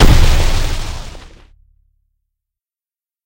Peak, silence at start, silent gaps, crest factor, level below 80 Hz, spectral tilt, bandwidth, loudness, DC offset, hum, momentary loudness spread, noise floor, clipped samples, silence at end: 0 dBFS; 0 s; none; 14 dB; -16 dBFS; -5 dB/octave; 16.5 kHz; -16 LUFS; under 0.1%; none; 22 LU; under -90 dBFS; 0.3%; 2.05 s